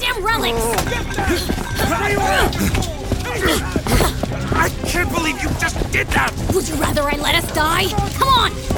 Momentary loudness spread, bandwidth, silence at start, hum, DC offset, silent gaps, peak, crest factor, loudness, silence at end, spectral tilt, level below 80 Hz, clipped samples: 5 LU; over 20 kHz; 0 s; none; under 0.1%; none; -2 dBFS; 16 dB; -18 LUFS; 0 s; -4 dB/octave; -26 dBFS; under 0.1%